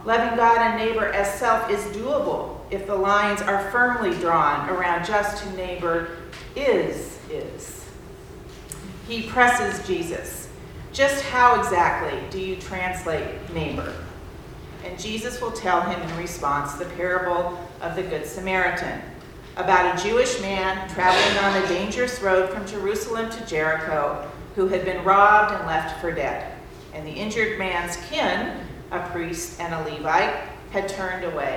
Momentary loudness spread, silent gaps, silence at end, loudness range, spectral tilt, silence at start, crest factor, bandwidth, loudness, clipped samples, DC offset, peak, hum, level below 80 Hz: 18 LU; none; 0 s; 7 LU; -4 dB/octave; 0 s; 22 dB; 20 kHz; -23 LUFS; under 0.1%; under 0.1%; -2 dBFS; none; -44 dBFS